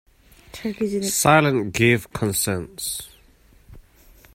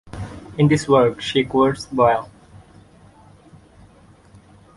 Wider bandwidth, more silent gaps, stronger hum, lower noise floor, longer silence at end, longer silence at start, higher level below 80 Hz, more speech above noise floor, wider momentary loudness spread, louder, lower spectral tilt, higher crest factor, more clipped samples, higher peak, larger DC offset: first, 16.5 kHz vs 11.5 kHz; neither; neither; first, -53 dBFS vs -49 dBFS; second, 0.55 s vs 2.5 s; first, 0.55 s vs 0.05 s; about the same, -50 dBFS vs -48 dBFS; about the same, 33 dB vs 32 dB; about the same, 16 LU vs 18 LU; second, -21 LUFS vs -18 LUFS; second, -4 dB/octave vs -6 dB/octave; about the same, 22 dB vs 20 dB; neither; about the same, -2 dBFS vs -2 dBFS; neither